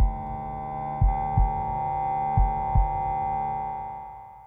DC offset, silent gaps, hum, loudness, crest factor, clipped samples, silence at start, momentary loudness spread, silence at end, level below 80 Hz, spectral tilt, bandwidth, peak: under 0.1%; none; none; -27 LUFS; 16 dB; under 0.1%; 0 s; 9 LU; 0 s; -30 dBFS; -11 dB/octave; 3.7 kHz; -10 dBFS